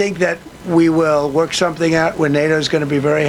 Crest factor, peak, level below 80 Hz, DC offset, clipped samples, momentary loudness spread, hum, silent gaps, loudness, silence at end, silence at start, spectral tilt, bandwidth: 14 dB; -2 dBFS; -46 dBFS; under 0.1%; under 0.1%; 5 LU; none; none; -16 LUFS; 0 s; 0 s; -5.5 dB/octave; 13 kHz